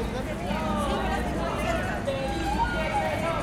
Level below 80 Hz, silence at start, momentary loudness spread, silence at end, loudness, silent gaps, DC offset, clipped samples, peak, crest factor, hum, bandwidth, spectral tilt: -36 dBFS; 0 s; 3 LU; 0 s; -28 LUFS; none; under 0.1%; under 0.1%; -14 dBFS; 12 dB; none; 16 kHz; -5.5 dB/octave